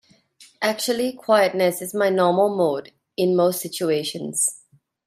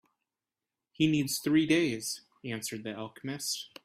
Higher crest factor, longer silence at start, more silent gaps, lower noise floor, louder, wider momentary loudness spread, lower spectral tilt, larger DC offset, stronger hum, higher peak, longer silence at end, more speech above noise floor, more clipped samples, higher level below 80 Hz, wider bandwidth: about the same, 18 dB vs 20 dB; second, 0.4 s vs 1 s; neither; second, -53 dBFS vs under -90 dBFS; first, -21 LUFS vs -31 LUFS; second, 7 LU vs 13 LU; about the same, -3.5 dB/octave vs -4 dB/octave; neither; neither; first, -4 dBFS vs -14 dBFS; first, 0.5 s vs 0.2 s; second, 32 dB vs over 59 dB; neither; about the same, -70 dBFS vs -68 dBFS; about the same, 16 kHz vs 16 kHz